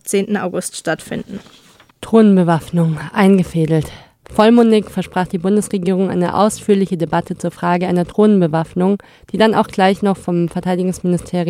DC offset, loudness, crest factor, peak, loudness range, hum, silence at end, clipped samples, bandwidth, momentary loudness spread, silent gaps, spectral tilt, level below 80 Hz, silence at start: under 0.1%; -15 LUFS; 14 dB; 0 dBFS; 3 LU; none; 0 s; under 0.1%; 15 kHz; 11 LU; none; -6.5 dB/octave; -48 dBFS; 0.05 s